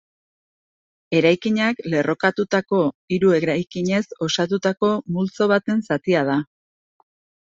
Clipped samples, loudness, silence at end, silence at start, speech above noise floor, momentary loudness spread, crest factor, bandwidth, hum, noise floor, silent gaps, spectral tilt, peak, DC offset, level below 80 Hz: under 0.1%; -20 LUFS; 1 s; 1.1 s; over 70 dB; 5 LU; 18 dB; 7.8 kHz; none; under -90 dBFS; 2.94-3.08 s; -6 dB/octave; -2 dBFS; under 0.1%; -62 dBFS